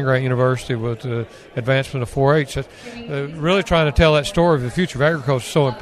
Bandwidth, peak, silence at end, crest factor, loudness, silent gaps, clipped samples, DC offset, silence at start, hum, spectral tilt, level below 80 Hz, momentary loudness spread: 13.5 kHz; -2 dBFS; 0 s; 18 dB; -19 LUFS; none; under 0.1%; under 0.1%; 0 s; none; -6 dB/octave; -34 dBFS; 12 LU